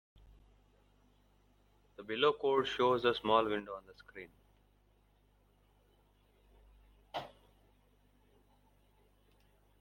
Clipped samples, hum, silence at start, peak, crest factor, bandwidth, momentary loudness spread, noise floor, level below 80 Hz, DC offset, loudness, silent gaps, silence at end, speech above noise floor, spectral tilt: under 0.1%; 50 Hz at -65 dBFS; 2 s; -16 dBFS; 24 dB; 16.5 kHz; 23 LU; -70 dBFS; -68 dBFS; under 0.1%; -33 LUFS; none; 2.55 s; 37 dB; -5.5 dB/octave